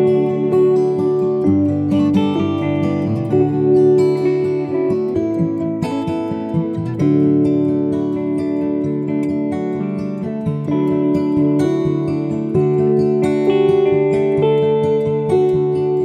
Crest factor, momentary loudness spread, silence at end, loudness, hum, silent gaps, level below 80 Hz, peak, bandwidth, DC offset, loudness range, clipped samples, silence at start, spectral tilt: 12 dB; 7 LU; 0 s; -17 LUFS; none; none; -52 dBFS; -4 dBFS; 9 kHz; under 0.1%; 3 LU; under 0.1%; 0 s; -9 dB/octave